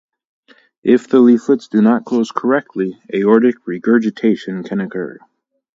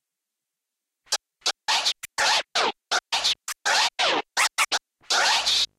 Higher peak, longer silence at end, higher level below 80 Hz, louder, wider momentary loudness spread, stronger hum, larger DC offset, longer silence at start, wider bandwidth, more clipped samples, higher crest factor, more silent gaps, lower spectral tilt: first, 0 dBFS vs -10 dBFS; first, 0.65 s vs 0.15 s; about the same, -64 dBFS vs -66 dBFS; first, -15 LUFS vs -23 LUFS; first, 12 LU vs 8 LU; neither; neither; second, 0.85 s vs 1.1 s; second, 7.6 kHz vs 16 kHz; neither; about the same, 16 dB vs 16 dB; neither; first, -7.5 dB/octave vs 2 dB/octave